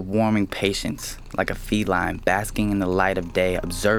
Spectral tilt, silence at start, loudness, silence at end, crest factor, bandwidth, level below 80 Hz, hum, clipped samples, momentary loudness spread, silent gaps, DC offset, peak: -5 dB/octave; 0 s; -23 LUFS; 0 s; 20 dB; 19.5 kHz; -38 dBFS; none; under 0.1%; 6 LU; none; under 0.1%; -4 dBFS